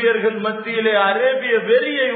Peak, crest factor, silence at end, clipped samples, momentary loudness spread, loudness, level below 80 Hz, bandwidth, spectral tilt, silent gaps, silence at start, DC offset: -4 dBFS; 14 dB; 0 s; under 0.1%; 5 LU; -17 LUFS; -80 dBFS; 4.5 kHz; -8 dB/octave; none; 0 s; under 0.1%